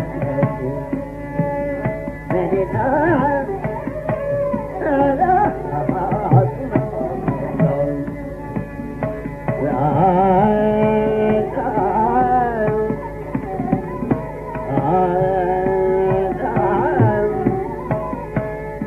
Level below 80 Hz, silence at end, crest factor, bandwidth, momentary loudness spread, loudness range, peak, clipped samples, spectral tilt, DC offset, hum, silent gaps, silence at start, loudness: -38 dBFS; 0 s; 18 dB; 13 kHz; 10 LU; 4 LU; 0 dBFS; under 0.1%; -10 dB/octave; under 0.1%; none; none; 0 s; -19 LUFS